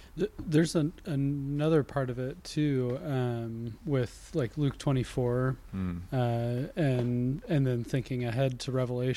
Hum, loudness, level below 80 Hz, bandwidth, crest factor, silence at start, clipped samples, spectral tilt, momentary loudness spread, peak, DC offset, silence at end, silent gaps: none; -31 LUFS; -52 dBFS; 12.5 kHz; 16 dB; 0 s; under 0.1%; -7.5 dB/octave; 7 LU; -14 dBFS; under 0.1%; 0 s; none